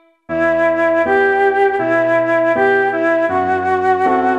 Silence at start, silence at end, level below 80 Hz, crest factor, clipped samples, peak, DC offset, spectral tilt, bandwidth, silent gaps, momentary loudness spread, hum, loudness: 0.3 s; 0 s; -52 dBFS; 10 dB; under 0.1%; -4 dBFS; under 0.1%; -6.5 dB/octave; 8.4 kHz; none; 3 LU; none; -14 LUFS